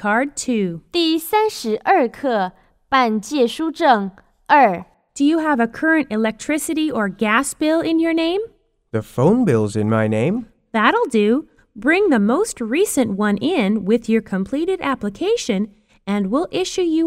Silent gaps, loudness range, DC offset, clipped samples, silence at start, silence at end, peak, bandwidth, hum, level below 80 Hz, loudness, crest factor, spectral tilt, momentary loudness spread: none; 2 LU; under 0.1%; under 0.1%; 0 s; 0 s; 0 dBFS; 16 kHz; none; -54 dBFS; -18 LUFS; 18 dB; -5 dB/octave; 7 LU